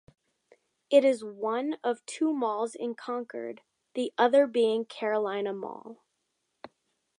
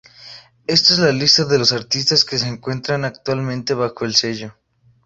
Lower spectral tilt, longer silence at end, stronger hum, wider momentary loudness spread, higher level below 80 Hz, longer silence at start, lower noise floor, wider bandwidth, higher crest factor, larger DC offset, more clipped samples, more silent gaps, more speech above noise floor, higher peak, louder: about the same, -4 dB/octave vs -3.5 dB/octave; first, 1.25 s vs 0.55 s; neither; first, 16 LU vs 12 LU; second, -84 dBFS vs -54 dBFS; first, 0.9 s vs 0.2 s; first, -79 dBFS vs -41 dBFS; first, 11 kHz vs 8 kHz; about the same, 20 dB vs 18 dB; neither; neither; neither; first, 52 dB vs 24 dB; second, -10 dBFS vs 0 dBFS; second, -28 LUFS vs -16 LUFS